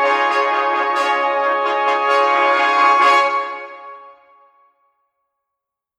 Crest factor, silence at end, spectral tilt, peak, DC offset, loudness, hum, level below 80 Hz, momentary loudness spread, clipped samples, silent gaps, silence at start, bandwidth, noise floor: 16 dB; 1.9 s; -0.5 dB/octave; -2 dBFS; under 0.1%; -15 LUFS; none; -76 dBFS; 12 LU; under 0.1%; none; 0 s; 11 kHz; -82 dBFS